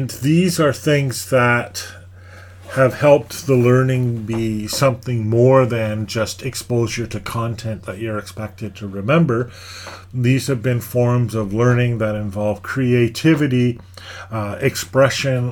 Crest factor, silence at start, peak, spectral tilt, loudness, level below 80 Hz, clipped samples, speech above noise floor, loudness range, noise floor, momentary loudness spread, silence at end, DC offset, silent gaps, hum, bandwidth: 18 dB; 0 s; 0 dBFS; -6 dB/octave; -18 LUFS; -48 dBFS; under 0.1%; 22 dB; 5 LU; -39 dBFS; 14 LU; 0 s; under 0.1%; none; none; 19 kHz